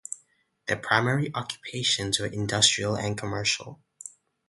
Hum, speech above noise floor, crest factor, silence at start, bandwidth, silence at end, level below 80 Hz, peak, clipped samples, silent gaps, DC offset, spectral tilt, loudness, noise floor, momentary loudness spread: none; 38 dB; 26 dB; 0.1 s; 11.5 kHz; 0.4 s; -56 dBFS; -4 dBFS; under 0.1%; none; under 0.1%; -2.5 dB/octave; -25 LUFS; -65 dBFS; 22 LU